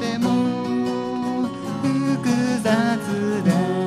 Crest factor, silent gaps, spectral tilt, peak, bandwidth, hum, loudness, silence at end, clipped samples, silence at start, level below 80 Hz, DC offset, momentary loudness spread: 14 dB; none; -6 dB/octave; -6 dBFS; 14.5 kHz; none; -22 LUFS; 0 s; under 0.1%; 0 s; -62 dBFS; under 0.1%; 5 LU